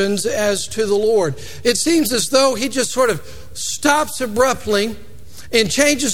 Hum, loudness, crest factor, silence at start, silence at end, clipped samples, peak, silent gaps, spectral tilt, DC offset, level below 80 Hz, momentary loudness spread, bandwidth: none; -17 LUFS; 18 dB; 0 s; 0 s; under 0.1%; 0 dBFS; none; -3 dB/octave; 3%; -44 dBFS; 9 LU; 18.5 kHz